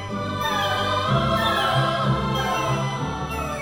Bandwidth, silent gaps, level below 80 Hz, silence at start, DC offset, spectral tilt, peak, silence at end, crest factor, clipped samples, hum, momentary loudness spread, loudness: 19 kHz; none; -40 dBFS; 0 s; 0.2%; -5 dB/octave; -8 dBFS; 0 s; 14 dB; under 0.1%; none; 7 LU; -22 LUFS